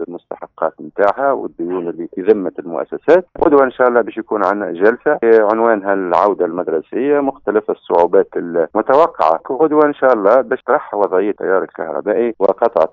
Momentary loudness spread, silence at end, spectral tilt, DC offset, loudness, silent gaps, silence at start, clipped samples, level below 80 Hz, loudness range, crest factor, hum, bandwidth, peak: 10 LU; 0.05 s; -5 dB/octave; under 0.1%; -15 LUFS; none; 0 s; under 0.1%; -54 dBFS; 2 LU; 14 dB; none; 5.8 kHz; 0 dBFS